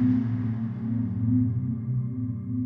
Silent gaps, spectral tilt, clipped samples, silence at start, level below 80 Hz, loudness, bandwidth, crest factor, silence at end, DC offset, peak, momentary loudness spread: none; -12 dB/octave; under 0.1%; 0 s; -54 dBFS; -28 LUFS; 3.1 kHz; 12 dB; 0 s; under 0.1%; -14 dBFS; 6 LU